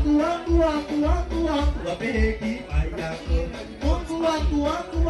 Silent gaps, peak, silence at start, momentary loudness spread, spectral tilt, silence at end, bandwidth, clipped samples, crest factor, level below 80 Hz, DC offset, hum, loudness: none; -8 dBFS; 0 s; 7 LU; -7 dB/octave; 0 s; 11.5 kHz; under 0.1%; 14 dB; -28 dBFS; under 0.1%; none; -25 LUFS